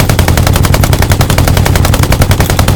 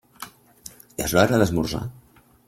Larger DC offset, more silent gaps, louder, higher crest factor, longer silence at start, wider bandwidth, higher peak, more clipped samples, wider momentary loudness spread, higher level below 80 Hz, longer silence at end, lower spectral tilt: neither; neither; first, -8 LUFS vs -22 LUFS; second, 8 dB vs 22 dB; second, 0 s vs 0.2 s; first, over 20 kHz vs 16.5 kHz; first, 0 dBFS vs -4 dBFS; first, 4% vs under 0.1%; second, 0 LU vs 24 LU; first, -14 dBFS vs -46 dBFS; second, 0 s vs 0.55 s; about the same, -5 dB/octave vs -5 dB/octave